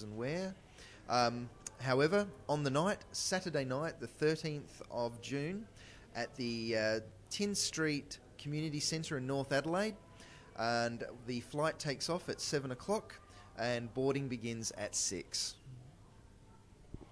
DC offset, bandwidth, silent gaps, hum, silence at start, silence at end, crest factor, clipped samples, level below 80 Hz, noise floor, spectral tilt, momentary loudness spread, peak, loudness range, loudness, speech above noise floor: under 0.1%; 11 kHz; none; none; 0 s; 0 s; 20 dB; under 0.1%; -64 dBFS; -60 dBFS; -4 dB/octave; 18 LU; -18 dBFS; 4 LU; -37 LUFS; 23 dB